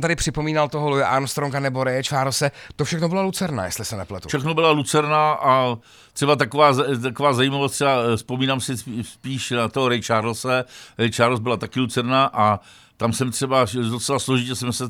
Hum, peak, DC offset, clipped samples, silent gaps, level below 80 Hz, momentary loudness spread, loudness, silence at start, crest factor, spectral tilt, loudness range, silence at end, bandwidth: none; -2 dBFS; under 0.1%; under 0.1%; none; -48 dBFS; 9 LU; -21 LUFS; 0 s; 18 dB; -4.5 dB/octave; 3 LU; 0 s; 19.5 kHz